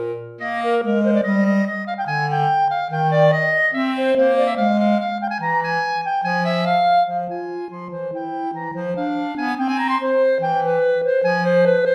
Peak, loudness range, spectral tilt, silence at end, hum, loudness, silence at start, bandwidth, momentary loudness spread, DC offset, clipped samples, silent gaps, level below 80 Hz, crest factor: -4 dBFS; 4 LU; -7 dB/octave; 0 s; none; -19 LUFS; 0 s; 10 kHz; 11 LU; under 0.1%; under 0.1%; none; -70 dBFS; 14 dB